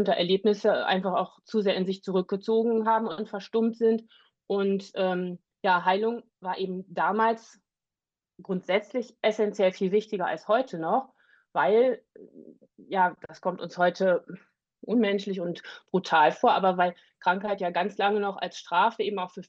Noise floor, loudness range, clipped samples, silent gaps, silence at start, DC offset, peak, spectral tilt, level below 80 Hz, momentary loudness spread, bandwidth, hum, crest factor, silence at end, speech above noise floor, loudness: under -90 dBFS; 3 LU; under 0.1%; none; 0 s; under 0.1%; -10 dBFS; -6 dB/octave; -78 dBFS; 10 LU; 7.6 kHz; none; 18 dB; 0.05 s; over 64 dB; -27 LUFS